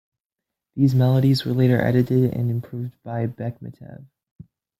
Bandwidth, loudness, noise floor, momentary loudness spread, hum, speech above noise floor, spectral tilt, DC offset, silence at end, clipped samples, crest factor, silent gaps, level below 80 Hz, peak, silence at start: 14.5 kHz; -21 LUFS; -86 dBFS; 18 LU; none; 65 dB; -8.5 dB/octave; under 0.1%; 0.8 s; under 0.1%; 18 dB; none; -56 dBFS; -4 dBFS; 0.75 s